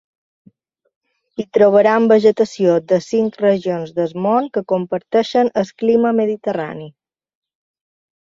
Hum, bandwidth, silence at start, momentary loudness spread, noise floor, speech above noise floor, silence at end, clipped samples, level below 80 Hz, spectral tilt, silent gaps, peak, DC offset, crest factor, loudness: none; 7.6 kHz; 1.4 s; 10 LU; -54 dBFS; 38 dB; 1.4 s; under 0.1%; -62 dBFS; -6.5 dB/octave; none; -2 dBFS; under 0.1%; 16 dB; -16 LUFS